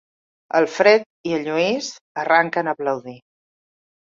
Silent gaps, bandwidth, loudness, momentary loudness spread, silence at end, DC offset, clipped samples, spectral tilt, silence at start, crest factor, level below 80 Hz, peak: 1.06-1.24 s, 2.01-2.15 s; 7.8 kHz; -20 LUFS; 13 LU; 1 s; under 0.1%; under 0.1%; -4 dB/octave; 0.55 s; 20 dB; -68 dBFS; -2 dBFS